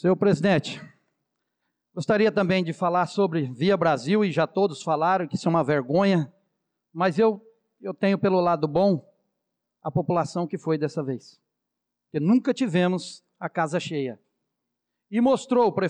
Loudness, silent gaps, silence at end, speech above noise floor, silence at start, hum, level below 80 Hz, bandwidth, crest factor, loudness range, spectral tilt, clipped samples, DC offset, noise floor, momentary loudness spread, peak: -24 LUFS; none; 0 s; 60 dB; 0.05 s; none; -66 dBFS; 9.8 kHz; 12 dB; 4 LU; -7 dB/octave; under 0.1%; under 0.1%; -84 dBFS; 13 LU; -12 dBFS